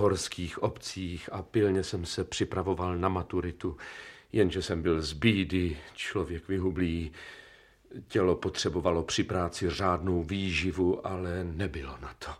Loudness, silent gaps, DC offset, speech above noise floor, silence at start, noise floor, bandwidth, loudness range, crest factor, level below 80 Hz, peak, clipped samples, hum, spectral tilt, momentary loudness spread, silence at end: -31 LUFS; none; under 0.1%; 25 dB; 0 s; -55 dBFS; 14 kHz; 2 LU; 22 dB; -48 dBFS; -8 dBFS; under 0.1%; none; -5.5 dB/octave; 12 LU; 0 s